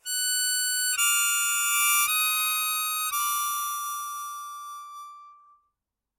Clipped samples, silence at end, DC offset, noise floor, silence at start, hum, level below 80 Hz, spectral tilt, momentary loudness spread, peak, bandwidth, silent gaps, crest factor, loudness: under 0.1%; 0.85 s; under 0.1%; -84 dBFS; 0.05 s; none; -82 dBFS; 7 dB/octave; 18 LU; -10 dBFS; 17 kHz; none; 18 dB; -23 LUFS